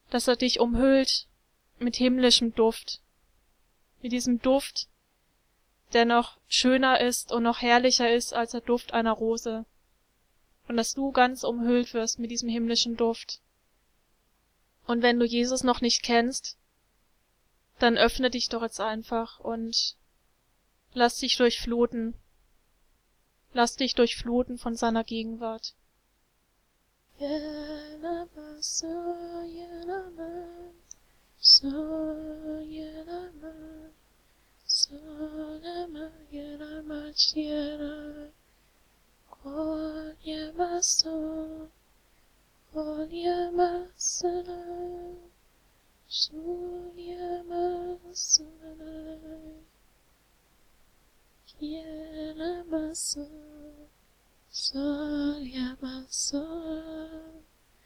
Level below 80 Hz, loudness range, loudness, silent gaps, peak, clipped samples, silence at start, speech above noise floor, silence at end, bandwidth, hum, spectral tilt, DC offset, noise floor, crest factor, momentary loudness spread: -54 dBFS; 11 LU; -27 LUFS; none; -8 dBFS; under 0.1%; 0.1 s; 42 dB; 0.45 s; 15.5 kHz; none; -2 dB/octave; under 0.1%; -70 dBFS; 22 dB; 19 LU